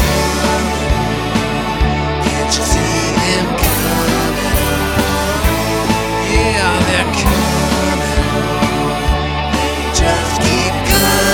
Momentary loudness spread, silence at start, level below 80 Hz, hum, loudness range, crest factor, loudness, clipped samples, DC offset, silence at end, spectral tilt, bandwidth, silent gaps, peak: 3 LU; 0 s; -22 dBFS; none; 1 LU; 14 dB; -14 LUFS; under 0.1%; under 0.1%; 0 s; -4 dB/octave; 19.5 kHz; none; 0 dBFS